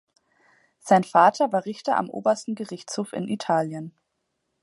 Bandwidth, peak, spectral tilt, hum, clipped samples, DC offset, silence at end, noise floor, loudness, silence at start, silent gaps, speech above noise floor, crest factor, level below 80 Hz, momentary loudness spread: 11.5 kHz; -4 dBFS; -5.5 dB/octave; none; under 0.1%; under 0.1%; 0.75 s; -77 dBFS; -23 LUFS; 0.85 s; none; 54 dB; 20 dB; -74 dBFS; 14 LU